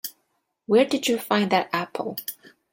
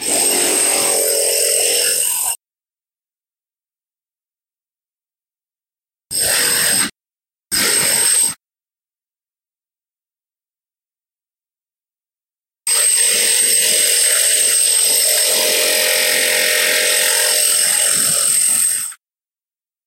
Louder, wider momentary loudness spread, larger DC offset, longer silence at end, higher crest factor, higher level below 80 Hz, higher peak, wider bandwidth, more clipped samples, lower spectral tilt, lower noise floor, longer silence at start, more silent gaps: second, -23 LUFS vs -12 LUFS; first, 13 LU vs 7 LU; neither; second, 0.25 s vs 0.9 s; about the same, 20 dB vs 16 dB; second, -70 dBFS vs -58 dBFS; second, -6 dBFS vs -2 dBFS; about the same, 17 kHz vs 16 kHz; neither; first, -4 dB/octave vs 1.5 dB/octave; second, -73 dBFS vs under -90 dBFS; about the same, 0.05 s vs 0 s; neither